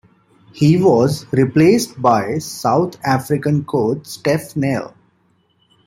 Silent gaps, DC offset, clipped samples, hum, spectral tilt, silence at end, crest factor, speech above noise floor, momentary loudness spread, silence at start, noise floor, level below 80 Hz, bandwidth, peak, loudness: none; under 0.1%; under 0.1%; none; -6.5 dB/octave; 1 s; 16 dB; 44 dB; 8 LU; 0.55 s; -60 dBFS; -54 dBFS; 16.5 kHz; -2 dBFS; -16 LUFS